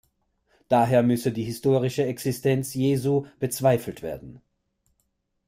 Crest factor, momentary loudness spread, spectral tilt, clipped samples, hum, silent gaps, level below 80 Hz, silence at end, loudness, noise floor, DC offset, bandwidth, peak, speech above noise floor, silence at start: 18 dB; 11 LU; -6.5 dB/octave; under 0.1%; none; none; -58 dBFS; 1.1 s; -24 LUFS; -74 dBFS; under 0.1%; 16 kHz; -8 dBFS; 51 dB; 0.7 s